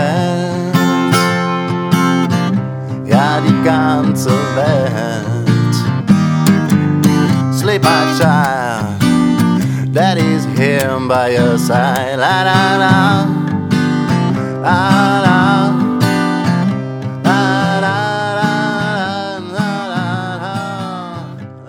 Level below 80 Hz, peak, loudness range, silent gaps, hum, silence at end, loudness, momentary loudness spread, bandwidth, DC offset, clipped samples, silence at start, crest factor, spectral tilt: -50 dBFS; 0 dBFS; 3 LU; none; none; 0 s; -13 LUFS; 8 LU; 19.5 kHz; under 0.1%; under 0.1%; 0 s; 14 dB; -6 dB/octave